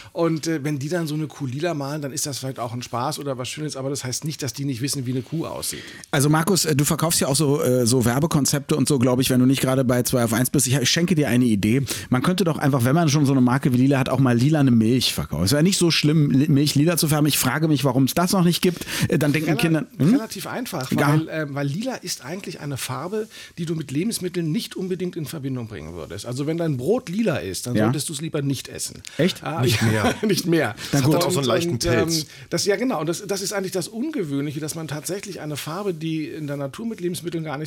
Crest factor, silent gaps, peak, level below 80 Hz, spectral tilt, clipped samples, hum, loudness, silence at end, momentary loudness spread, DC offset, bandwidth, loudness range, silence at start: 14 dB; none; -8 dBFS; -52 dBFS; -5 dB/octave; under 0.1%; none; -22 LUFS; 0 s; 11 LU; under 0.1%; 18 kHz; 9 LU; 0 s